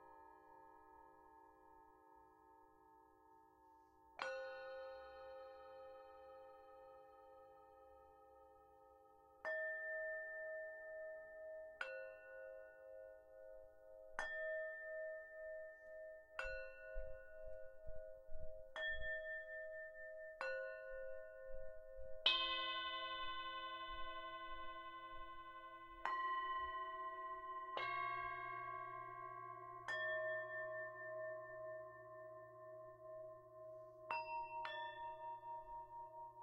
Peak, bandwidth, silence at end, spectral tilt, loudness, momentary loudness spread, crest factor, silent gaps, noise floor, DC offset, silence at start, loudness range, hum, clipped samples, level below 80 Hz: -22 dBFS; 10.5 kHz; 0 s; -3 dB/octave; -48 LUFS; 22 LU; 28 dB; none; -69 dBFS; under 0.1%; 0 s; 14 LU; none; under 0.1%; -66 dBFS